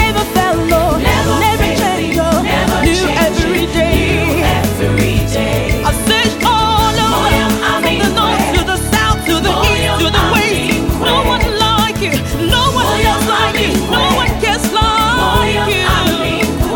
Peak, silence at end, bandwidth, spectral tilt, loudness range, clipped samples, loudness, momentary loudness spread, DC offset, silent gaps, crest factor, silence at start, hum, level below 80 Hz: 0 dBFS; 0 s; 19 kHz; -4.5 dB/octave; 1 LU; under 0.1%; -12 LUFS; 3 LU; under 0.1%; none; 12 dB; 0 s; none; -22 dBFS